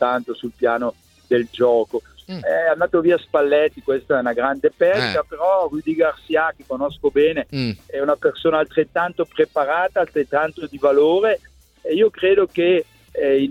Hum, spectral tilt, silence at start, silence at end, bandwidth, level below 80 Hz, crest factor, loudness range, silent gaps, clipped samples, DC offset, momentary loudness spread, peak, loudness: none; -6.5 dB/octave; 0 s; 0 s; 12 kHz; -54 dBFS; 16 dB; 2 LU; none; under 0.1%; under 0.1%; 9 LU; -4 dBFS; -19 LUFS